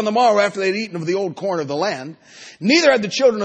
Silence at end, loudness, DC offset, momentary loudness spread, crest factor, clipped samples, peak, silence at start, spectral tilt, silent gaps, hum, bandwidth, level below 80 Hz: 0 s; -18 LUFS; under 0.1%; 10 LU; 16 dB; under 0.1%; -2 dBFS; 0 s; -4 dB/octave; none; none; 9 kHz; -68 dBFS